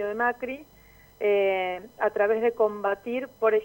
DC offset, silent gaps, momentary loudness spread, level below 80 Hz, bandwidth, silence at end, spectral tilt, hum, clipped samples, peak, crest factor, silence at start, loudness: under 0.1%; none; 9 LU; -62 dBFS; 16.5 kHz; 0 s; -5.5 dB/octave; none; under 0.1%; -10 dBFS; 16 dB; 0 s; -26 LUFS